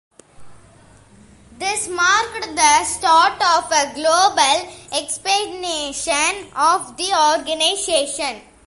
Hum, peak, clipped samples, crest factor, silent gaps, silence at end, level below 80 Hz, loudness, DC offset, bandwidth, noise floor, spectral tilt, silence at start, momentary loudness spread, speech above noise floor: none; -2 dBFS; under 0.1%; 18 dB; none; 0.25 s; -52 dBFS; -17 LUFS; under 0.1%; 11.5 kHz; -48 dBFS; 0 dB/octave; 0.4 s; 9 LU; 30 dB